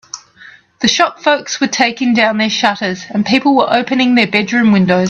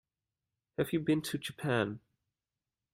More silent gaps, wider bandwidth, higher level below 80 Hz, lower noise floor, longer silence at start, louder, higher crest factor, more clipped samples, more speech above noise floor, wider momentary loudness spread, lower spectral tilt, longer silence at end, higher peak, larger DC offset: neither; second, 8.2 kHz vs 16 kHz; first, -54 dBFS vs -70 dBFS; second, -41 dBFS vs under -90 dBFS; second, 0.15 s vs 0.8 s; first, -13 LUFS vs -34 LUFS; second, 14 dB vs 20 dB; neither; second, 28 dB vs over 57 dB; second, 7 LU vs 10 LU; second, -4 dB/octave vs -5.5 dB/octave; second, 0 s vs 0.95 s; first, 0 dBFS vs -16 dBFS; neither